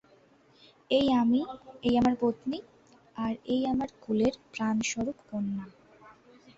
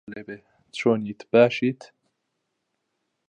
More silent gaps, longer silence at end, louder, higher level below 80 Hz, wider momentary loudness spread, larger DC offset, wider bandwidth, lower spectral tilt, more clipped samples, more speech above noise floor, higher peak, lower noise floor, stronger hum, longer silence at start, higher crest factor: neither; second, 0.45 s vs 1.45 s; second, -29 LUFS vs -22 LUFS; first, -58 dBFS vs -70 dBFS; second, 12 LU vs 22 LU; neither; second, 7.8 kHz vs 9.6 kHz; second, -5 dB/octave vs -6.5 dB/octave; neither; second, 32 dB vs 55 dB; second, -14 dBFS vs -4 dBFS; second, -61 dBFS vs -78 dBFS; neither; first, 0.9 s vs 0.1 s; second, 16 dB vs 22 dB